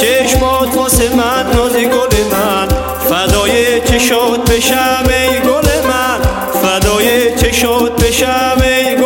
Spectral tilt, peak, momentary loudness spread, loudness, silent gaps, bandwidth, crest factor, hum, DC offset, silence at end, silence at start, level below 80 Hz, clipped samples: -3.5 dB/octave; 0 dBFS; 3 LU; -11 LUFS; none; 17 kHz; 10 dB; none; under 0.1%; 0 s; 0 s; -22 dBFS; under 0.1%